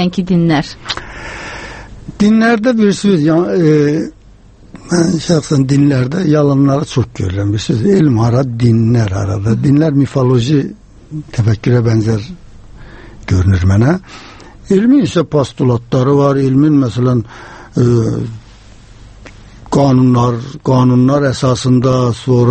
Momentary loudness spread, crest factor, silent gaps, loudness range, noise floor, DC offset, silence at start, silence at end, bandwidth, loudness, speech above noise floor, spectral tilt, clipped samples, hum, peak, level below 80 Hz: 13 LU; 12 dB; none; 3 LU; -40 dBFS; under 0.1%; 0 s; 0 s; 8.8 kHz; -12 LUFS; 29 dB; -7.5 dB/octave; under 0.1%; none; 0 dBFS; -36 dBFS